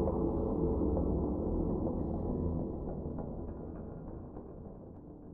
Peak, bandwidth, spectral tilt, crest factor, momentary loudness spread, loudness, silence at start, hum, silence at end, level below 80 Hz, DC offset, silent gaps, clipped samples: -18 dBFS; 2 kHz; -13.5 dB/octave; 16 dB; 16 LU; -36 LUFS; 0 s; none; 0 s; -42 dBFS; under 0.1%; none; under 0.1%